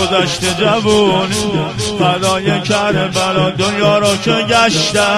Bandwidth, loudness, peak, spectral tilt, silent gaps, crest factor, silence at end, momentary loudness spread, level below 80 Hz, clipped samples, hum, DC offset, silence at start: 13 kHz; -13 LUFS; 0 dBFS; -4 dB/octave; none; 12 dB; 0 s; 4 LU; -42 dBFS; under 0.1%; none; under 0.1%; 0 s